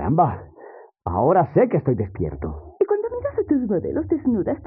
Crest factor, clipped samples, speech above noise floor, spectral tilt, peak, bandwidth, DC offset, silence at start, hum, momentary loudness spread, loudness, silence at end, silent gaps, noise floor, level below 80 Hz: 18 dB; under 0.1%; 23 dB; -11 dB/octave; -4 dBFS; 3.2 kHz; under 0.1%; 0 s; none; 10 LU; -22 LUFS; 0 s; none; -44 dBFS; -44 dBFS